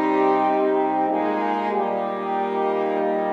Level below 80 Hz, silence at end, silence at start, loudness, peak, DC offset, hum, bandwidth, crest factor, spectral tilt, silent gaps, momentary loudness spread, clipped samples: -78 dBFS; 0 s; 0 s; -22 LUFS; -8 dBFS; under 0.1%; none; 6.6 kHz; 12 dB; -7.5 dB/octave; none; 5 LU; under 0.1%